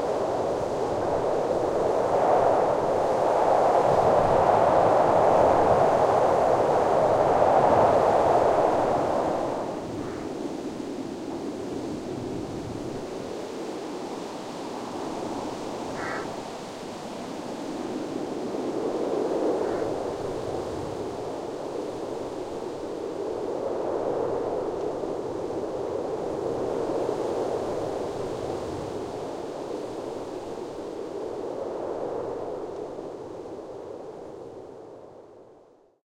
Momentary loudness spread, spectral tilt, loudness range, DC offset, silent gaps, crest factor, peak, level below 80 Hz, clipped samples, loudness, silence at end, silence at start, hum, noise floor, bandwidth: 15 LU; -6 dB/octave; 13 LU; under 0.1%; none; 18 dB; -8 dBFS; -54 dBFS; under 0.1%; -26 LUFS; 0.65 s; 0 s; none; -56 dBFS; 15.5 kHz